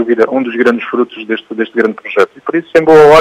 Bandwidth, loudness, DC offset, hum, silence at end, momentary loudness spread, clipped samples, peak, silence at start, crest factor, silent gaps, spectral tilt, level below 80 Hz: 9.8 kHz; -11 LUFS; under 0.1%; none; 0 s; 11 LU; 1%; 0 dBFS; 0 s; 10 dB; none; -6 dB/octave; -50 dBFS